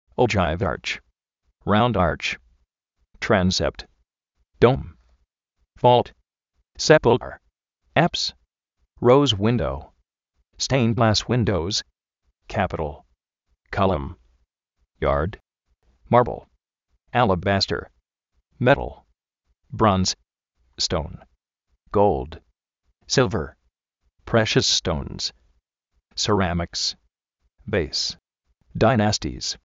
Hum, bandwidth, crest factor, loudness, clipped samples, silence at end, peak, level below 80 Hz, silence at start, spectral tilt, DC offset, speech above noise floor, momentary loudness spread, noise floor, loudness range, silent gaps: none; 8 kHz; 22 dB; -22 LUFS; under 0.1%; 0.2 s; -2 dBFS; -42 dBFS; 0.2 s; -4 dB/octave; under 0.1%; 52 dB; 14 LU; -73 dBFS; 5 LU; none